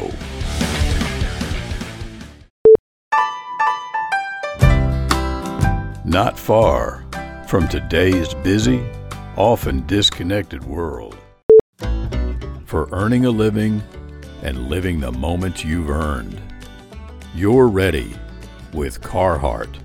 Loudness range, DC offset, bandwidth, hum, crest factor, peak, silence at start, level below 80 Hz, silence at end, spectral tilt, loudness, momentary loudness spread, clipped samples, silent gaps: 4 LU; under 0.1%; 18 kHz; none; 18 dB; 0 dBFS; 0 s; -28 dBFS; 0 s; -6 dB/octave; -18 LUFS; 18 LU; under 0.1%; 2.50-2.65 s, 2.79-3.11 s, 11.43-11.49 s, 11.61-11.73 s